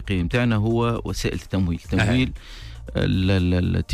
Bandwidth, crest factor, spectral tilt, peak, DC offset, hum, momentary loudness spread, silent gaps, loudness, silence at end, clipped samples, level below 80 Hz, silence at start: 13.5 kHz; 12 dB; -6.5 dB/octave; -10 dBFS; under 0.1%; none; 8 LU; none; -22 LUFS; 0 s; under 0.1%; -34 dBFS; 0 s